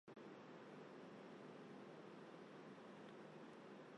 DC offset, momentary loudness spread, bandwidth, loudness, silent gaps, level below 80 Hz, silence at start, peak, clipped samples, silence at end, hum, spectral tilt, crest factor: under 0.1%; 1 LU; 10 kHz; -59 LUFS; none; under -90 dBFS; 0.05 s; -46 dBFS; under 0.1%; 0 s; none; -6 dB/octave; 12 dB